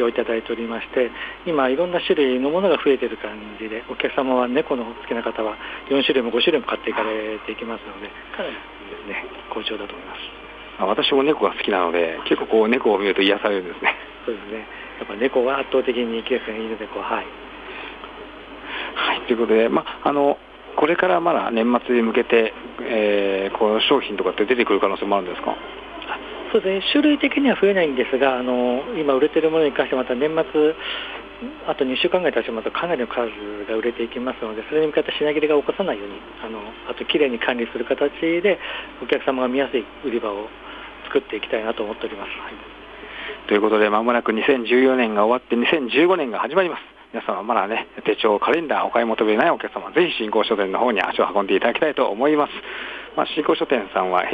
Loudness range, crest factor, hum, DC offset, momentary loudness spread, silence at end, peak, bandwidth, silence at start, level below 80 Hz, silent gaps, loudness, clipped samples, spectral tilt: 5 LU; 18 dB; none; under 0.1%; 14 LU; 0 s; -4 dBFS; 5 kHz; 0 s; -54 dBFS; none; -21 LUFS; under 0.1%; -7 dB/octave